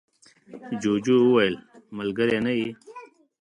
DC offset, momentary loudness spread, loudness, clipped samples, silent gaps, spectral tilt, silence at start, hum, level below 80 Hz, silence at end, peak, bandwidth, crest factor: under 0.1%; 23 LU; -23 LUFS; under 0.1%; none; -6 dB/octave; 0.5 s; none; -64 dBFS; 0.35 s; -8 dBFS; 10.5 kHz; 18 dB